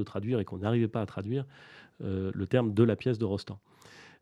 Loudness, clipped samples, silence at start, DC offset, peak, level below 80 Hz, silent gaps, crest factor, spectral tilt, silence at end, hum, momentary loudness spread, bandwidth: -31 LUFS; under 0.1%; 0 s; under 0.1%; -12 dBFS; -66 dBFS; none; 20 dB; -8.5 dB/octave; 0.15 s; none; 14 LU; 10 kHz